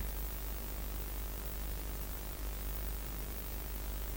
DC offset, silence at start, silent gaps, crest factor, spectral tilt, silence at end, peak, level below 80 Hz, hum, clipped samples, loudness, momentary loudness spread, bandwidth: under 0.1%; 0 s; none; 14 dB; -4 dB/octave; 0 s; -26 dBFS; -42 dBFS; none; under 0.1%; -42 LUFS; 1 LU; 17.5 kHz